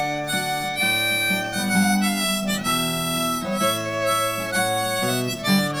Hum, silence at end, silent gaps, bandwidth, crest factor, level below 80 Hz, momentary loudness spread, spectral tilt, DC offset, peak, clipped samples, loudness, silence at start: none; 0 s; none; over 20 kHz; 16 dB; -50 dBFS; 4 LU; -3.5 dB/octave; under 0.1%; -8 dBFS; under 0.1%; -21 LUFS; 0 s